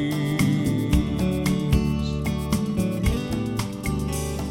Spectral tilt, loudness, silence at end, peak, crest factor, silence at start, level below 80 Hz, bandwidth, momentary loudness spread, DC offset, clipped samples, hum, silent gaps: -6 dB/octave; -24 LUFS; 0 s; -8 dBFS; 14 dB; 0 s; -32 dBFS; 16.5 kHz; 5 LU; under 0.1%; under 0.1%; none; none